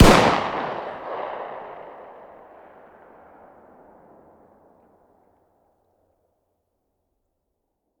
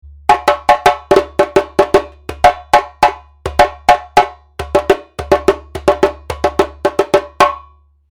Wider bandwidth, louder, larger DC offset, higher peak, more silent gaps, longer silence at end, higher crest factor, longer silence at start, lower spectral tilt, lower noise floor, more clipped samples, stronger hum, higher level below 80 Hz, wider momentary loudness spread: about the same, over 20 kHz vs 19 kHz; second, -22 LUFS vs -14 LUFS; second, under 0.1% vs 0.2%; about the same, 0 dBFS vs 0 dBFS; neither; first, 6 s vs 0.55 s; first, 26 dB vs 14 dB; second, 0 s vs 0.3 s; about the same, -5 dB/octave vs -4.5 dB/octave; first, -77 dBFS vs -44 dBFS; second, under 0.1% vs 0.5%; neither; about the same, -34 dBFS vs -34 dBFS; first, 29 LU vs 6 LU